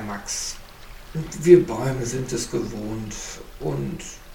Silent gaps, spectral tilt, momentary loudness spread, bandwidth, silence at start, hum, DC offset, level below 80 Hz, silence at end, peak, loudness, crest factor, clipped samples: none; -5.5 dB/octave; 19 LU; 16.5 kHz; 0 s; none; under 0.1%; -42 dBFS; 0 s; 0 dBFS; -23 LUFS; 24 dB; under 0.1%